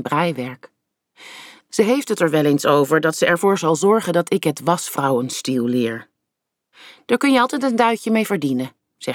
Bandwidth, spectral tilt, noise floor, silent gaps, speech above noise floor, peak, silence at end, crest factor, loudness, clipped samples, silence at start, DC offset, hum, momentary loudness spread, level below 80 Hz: 19 kHz; -5 dB/octave; -80 dBFS; none; 62 dB; -4 dBFS; 0 s; 16 dB; -18 LUFS; under 0.1%; 0 s; under 0.1%; none; 14 LU; -70 dBFS